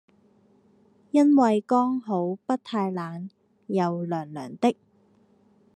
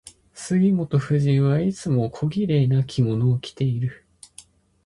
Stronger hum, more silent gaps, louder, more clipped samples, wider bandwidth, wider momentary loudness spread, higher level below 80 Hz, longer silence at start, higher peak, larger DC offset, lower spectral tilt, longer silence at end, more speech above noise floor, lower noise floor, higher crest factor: neither; neither; second, -25 LUFS vs -22 LUFS; neither; second, 9.8 kHz vs 11.5 kHz; first, 17 LU vs 6 LU; second, -82 dBFS vs -54 dBFS; first, 1.15 s vs 0.35 s; about the same, -8 dBFS vs -8 dBFS; neither; about the same, -7.5 dB/octave vs -7.5 dB/octave; about the same, 1 s vs 0.9 s; first, 38 dB vs 30 dB; first, -61 dBFS vs -50 dBFS; about the same, 18 dB vs 14 dB